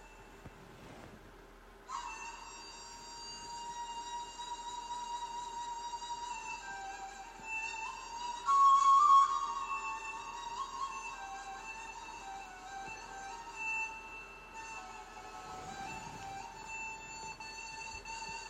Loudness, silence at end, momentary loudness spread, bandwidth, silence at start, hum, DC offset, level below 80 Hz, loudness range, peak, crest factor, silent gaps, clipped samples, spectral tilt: -36 LUFS; 0 s; 17 LU; 13 kHz; 0 s; none; under 0.1%; -62 dBFS; 15 LU; -16 dBFS; 20 dB; none; under 0.1%; -1 dB/octave